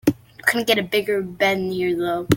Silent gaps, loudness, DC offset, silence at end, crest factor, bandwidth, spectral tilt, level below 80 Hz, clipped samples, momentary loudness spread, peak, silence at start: none; -21 LUFS; under 0.1%; 0 s; 20 dB; 17 kHz; -4.5 dB/octave; -50 dBFS; under 0.1%; 5 LU; -2 dBFS; 0.05 s